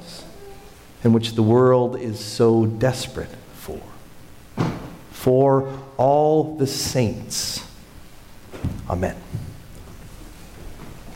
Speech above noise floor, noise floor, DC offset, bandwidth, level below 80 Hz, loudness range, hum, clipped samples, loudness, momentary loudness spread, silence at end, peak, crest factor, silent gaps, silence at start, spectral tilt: 23 dB; -42 dBFS; under 0.1%; 16.5 kHz; -44 dBFS; 10 LU; none; under 0.1%; -21 LUFS; 25 LU; 0 s; -8 dBFS; 16 dB; none; 0 s; -6 dB/octave